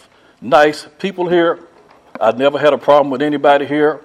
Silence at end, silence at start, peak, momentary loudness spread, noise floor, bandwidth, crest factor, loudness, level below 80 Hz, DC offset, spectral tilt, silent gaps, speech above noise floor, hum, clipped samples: 0.05 s; 0.4 s; 0 dBFS; 11 LU; -38 dBFS; 12 kHz; 14 dB; -14 LUFS; -60 dBFS; under 0.1%; -5.5 dB/octave; none; 24 dB; none; under 0.1%